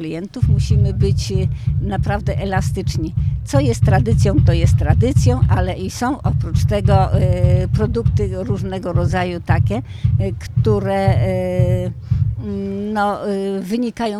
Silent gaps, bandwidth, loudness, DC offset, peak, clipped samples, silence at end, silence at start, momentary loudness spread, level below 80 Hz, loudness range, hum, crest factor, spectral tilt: none; 13 kHz; -18 LUFS; under 0.1%; 0 dBFS; under 0.1%; 0 s; 0 s; 7 LU; -26 dBFS; 3 LU; none; 16 dB; -7.5 dB/octave